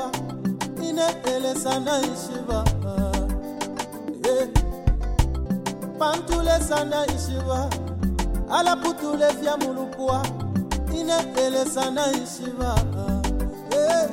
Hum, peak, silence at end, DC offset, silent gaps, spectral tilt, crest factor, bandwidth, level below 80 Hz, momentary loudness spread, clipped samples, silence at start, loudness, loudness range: none; -4 dBFS; 0 s; under 0.1%; none; -5 dB/octave; 20 dB; 16.5 kHz; -30 dBFS; 7 LU; under 0.1%; 0 s; -25 LUFS; 2 LU